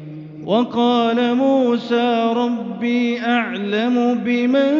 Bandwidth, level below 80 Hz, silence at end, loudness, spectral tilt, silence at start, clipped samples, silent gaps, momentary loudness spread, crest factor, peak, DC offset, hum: 7 kHz; -68 dBFS; 0 s; -18 LUFS; -3.5 dB/octave; 0 s; under 0.1%; none; 5 LU; 12 dB; -4 dBFS; under 0.1%; none